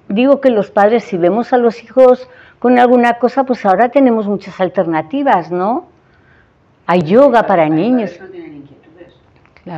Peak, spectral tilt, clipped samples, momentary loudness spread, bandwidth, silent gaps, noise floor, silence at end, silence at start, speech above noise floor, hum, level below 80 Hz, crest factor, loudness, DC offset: 0 dBFS; -8 dB/octave; 0.2%; 9 LU; 7.6 kHz; none; -50 dBFS; 0 s; 0.1 s; 39 dB; none; -58 dBFS; 12 dB; -12 LUFS; under 0.1%